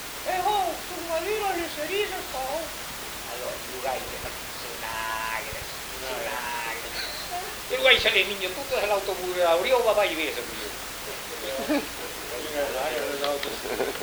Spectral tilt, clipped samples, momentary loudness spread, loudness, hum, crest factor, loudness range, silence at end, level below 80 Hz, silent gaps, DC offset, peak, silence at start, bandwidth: -2 dB/octave; under 0.1%; 12 LU; -27 LUFS; none; 24 dB; 8 LU; 0 s; -52 dBFS; none; under 0.1%; -4 dBFS; 0 s; over 20 kHz